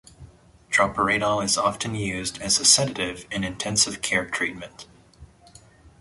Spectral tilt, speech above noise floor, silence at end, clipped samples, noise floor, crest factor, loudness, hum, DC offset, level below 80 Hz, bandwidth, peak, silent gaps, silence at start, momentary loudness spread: -2 dB/octave; 28 dB; 0.15 s; under 0.1%; -52 dBFS; 24 dB; -22 LUFS; none; under 0.1%; -52 dBFS; 12 kHz; -2 dBFS; none; 0.2 s; 13 LU